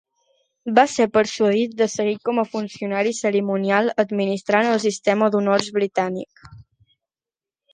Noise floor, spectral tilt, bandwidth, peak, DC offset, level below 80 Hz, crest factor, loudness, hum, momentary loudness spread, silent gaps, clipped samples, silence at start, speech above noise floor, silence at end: under -90 dBFS; -4.5 dB/octave; 9.8 kHz; 0 dBFS; under 0.1%; -64 dBFS; 20 dB; -20 LUFS; none; 8 LU; none; under 0.1%; 0.65 s; over 70 dB; 1.1 s